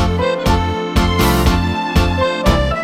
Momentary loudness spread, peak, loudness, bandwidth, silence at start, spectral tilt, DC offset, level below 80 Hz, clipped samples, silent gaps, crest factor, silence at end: 3 LU; -2 dBFS; -15 LUFS; 16.5 kHz; 0 s; -5.5 dB/octave; under 0.1%; -20 dBFS; under 0.1%; none; 14 dB; 0 s